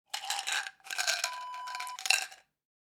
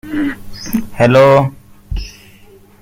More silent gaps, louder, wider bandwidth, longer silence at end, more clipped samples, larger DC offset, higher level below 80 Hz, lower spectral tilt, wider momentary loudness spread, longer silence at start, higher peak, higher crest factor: neither; second, -32 LUFS vs -12 LUFS; first, over 20 kHz vs 16.5 kHz; second, 0.55 s vs 0.7 s; neither; neither; second, -90 dBFS vs -32 dBFS; second, 4.5 dB/octave vs -6.5 dB/octave; second, 11 LU vs 20 LU; about the same, 0.15 s vs 0.05 s; second, -6 dBFS vs 0 dBFS; first, 30 dB vs 14 dB